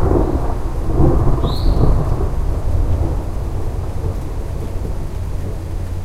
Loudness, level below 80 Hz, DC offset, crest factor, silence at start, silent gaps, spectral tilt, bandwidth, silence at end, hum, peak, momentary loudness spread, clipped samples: -20 LUFS; -18 dBFS; under 0.1%; 16 dB; 0 s; none; -8 dB/octave; 13 kHz; 0 s; none; 0 dBFS; 9 LU; under 0.1%